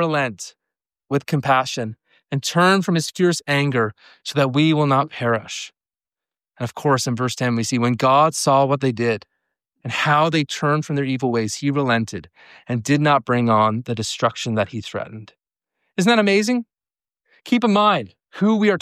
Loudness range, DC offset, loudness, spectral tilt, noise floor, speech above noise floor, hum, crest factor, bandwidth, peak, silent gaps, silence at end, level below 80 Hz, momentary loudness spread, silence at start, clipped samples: 3 LU; under 0.1%; -19 LUFS; -5 dB/octave; under -90 dBFS; over 71 dB; none; 16 dB; 15 kHz; -4 dBFS; none; 0.05 s; -64 dBFS; 14 LU; 0 s; under 0.1%